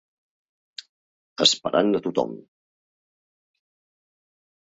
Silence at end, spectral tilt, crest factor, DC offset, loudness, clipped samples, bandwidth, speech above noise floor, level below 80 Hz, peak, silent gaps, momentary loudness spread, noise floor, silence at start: 2.3 s; -3 dB/octave; 24 dB; under 0.1%; -22 LUFS; under 0.1%; 8.4 kHz; over 68 dB; -70 dBFS; -4 dBFS; none; 23 LU; under -90 dBFS; 1.4 s